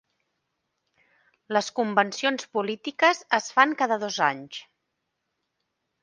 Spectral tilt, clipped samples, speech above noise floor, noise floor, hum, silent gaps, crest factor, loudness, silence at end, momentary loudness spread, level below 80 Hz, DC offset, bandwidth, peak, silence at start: -3 dB/octave; under 0.1%; 55 dB; -80 dBFS; none; none; 24 dB; -24 LUFS; 1.4 s; 10 LU; -80 dBFS; under 0.1%; 10 kHz; -2 dBFS; 1.5 s